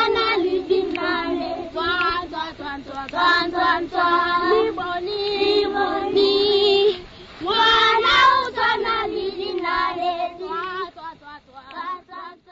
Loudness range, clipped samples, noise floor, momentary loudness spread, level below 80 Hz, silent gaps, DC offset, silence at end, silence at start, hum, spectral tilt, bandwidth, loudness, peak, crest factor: 7 LU; under 0.1%; -42 dBFS; 16 LU; -50 dBFS; none; under 0.1%; 0.2 s; 0 s; none; -4 dB/octave; 7.8 kHz; -20 LUFS; -6 dBFS; 16 dB